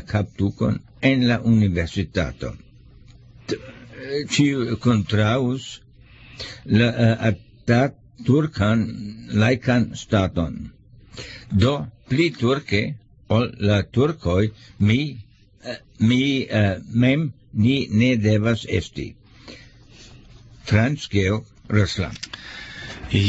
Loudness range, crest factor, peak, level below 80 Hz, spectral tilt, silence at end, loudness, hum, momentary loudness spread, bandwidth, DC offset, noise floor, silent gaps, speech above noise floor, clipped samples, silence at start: 4 LU; 16 dB; -4 dBFS; -44 dBFS; -6.5 dB/octave; 0 s; -21 LUFS; none; 16 LU; 8 kHz; under 0.1%; -47 dBFS; none; 27 dB; under 0.1%; 0 s